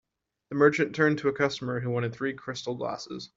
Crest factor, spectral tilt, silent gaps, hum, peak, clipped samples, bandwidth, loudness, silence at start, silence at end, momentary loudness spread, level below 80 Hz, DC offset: 20 dB; -6 dB/octave; none; none; -8 dBFS; under 0.1%; 7.8 kHz; -28 LUFS; 0.5 s; 0.1 s; 12 LU; -68 dBFS; under 0.1%